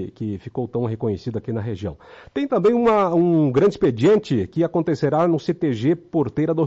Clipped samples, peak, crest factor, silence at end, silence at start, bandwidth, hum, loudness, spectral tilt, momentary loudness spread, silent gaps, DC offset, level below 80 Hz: under 0.1%; -8 dBFS; 12 dB; 0 s; 0 s; 7.8 kHz; none; -20 LUFS; -8.5 dB/octave; 11 LU; none; under 0.1%; -54 dBFS